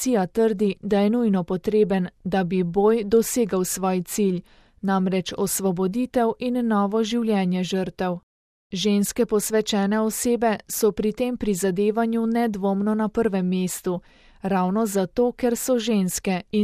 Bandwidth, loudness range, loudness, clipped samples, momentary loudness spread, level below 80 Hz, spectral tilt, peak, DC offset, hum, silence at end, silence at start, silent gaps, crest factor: 15.5 kHz; 2 LU; -23 LUFS; under 0.1%; 5 LU; -52 dBFS; -5.5 dB/octave; -8 dBFS; under 0.1%; none; 0 s; 0 s; 8.23-8.70 s; 14 dB